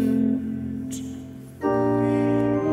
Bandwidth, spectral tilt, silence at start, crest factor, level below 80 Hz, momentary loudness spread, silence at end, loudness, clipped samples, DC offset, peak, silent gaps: 15 kHz; -8 dB/octave; 0 s; 14 dB; -52 dBFS; 13 LU; 0 s; -24 LUFS; under 0.1%; under 0.1%; -10 dBFS; none